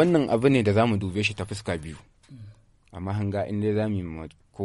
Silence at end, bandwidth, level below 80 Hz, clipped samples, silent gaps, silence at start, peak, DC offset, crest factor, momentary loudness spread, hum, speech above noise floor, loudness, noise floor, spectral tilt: 0 s; 11.5 kHz; -52 dBFS; under 0.1%; none; 0 s; -8 dBFS; under 0.1%; 18 dB; 20 LU; none; 26 dB; -25 LUFS; -50 dBFS; -7 dB/octave